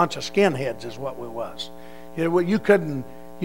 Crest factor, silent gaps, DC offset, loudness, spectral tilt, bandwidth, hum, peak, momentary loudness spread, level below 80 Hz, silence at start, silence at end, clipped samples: 22 dB; none; 1%; -24 LUFS; -6 dB/octave; 16 kHz; none; -2 dBFS; 16 LU; -56 dBFS; 0 s; 0 s; under 0.1%